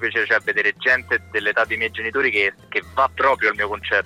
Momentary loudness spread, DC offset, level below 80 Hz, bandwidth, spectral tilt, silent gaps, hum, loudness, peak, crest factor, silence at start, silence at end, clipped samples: 5 LU; under 0.1%; -52 dBFS; 15.5 kHz; -4 dB/octave; none; none; -19 LUFS; -4 dBFS; 16 dB; 0 s; 0 s; under 0.1%